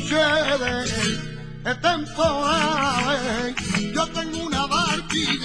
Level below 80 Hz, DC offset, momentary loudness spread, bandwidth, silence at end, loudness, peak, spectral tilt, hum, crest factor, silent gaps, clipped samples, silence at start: -42 dBFS; under 0.1%; 6 LU; 11 kHz; 0 s; -22 LUFS; -6 dBFS; -3.5 dB/octave; none; 16 dB; none; under 0.1%; 0 s